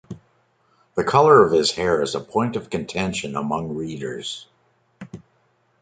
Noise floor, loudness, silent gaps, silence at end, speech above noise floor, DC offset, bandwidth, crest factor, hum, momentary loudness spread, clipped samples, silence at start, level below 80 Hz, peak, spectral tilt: -64 dBFS; -20 LUFS; none; 0.65 s; 44 dB; under 0.1%; 9.4 kHz; 20 dB; none; 26 LU; under 0.1%; 0.1 s; -52 dBFS; -2 dBFS; -5 dB/octave